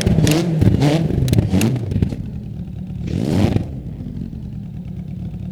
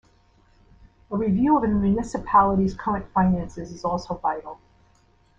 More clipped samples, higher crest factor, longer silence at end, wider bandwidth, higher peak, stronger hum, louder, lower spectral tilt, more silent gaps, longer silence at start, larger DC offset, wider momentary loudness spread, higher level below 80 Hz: neither; about the same, 18 dB vs 20 dB; second, 0 s vs 0.85 s; first, 18 kHz vs 8 kHz; first, 0 dBFS vs -4 dBFS; neither; first, -19 LUFS vs -23 LUFS; about the same, -7 dB/octave vs -8 dB/octave; neither; second, 0 s vs 1.1 s; neither; about the same, 14 LU vs 12 LU; first, -30 dBFS vs -44 dBFS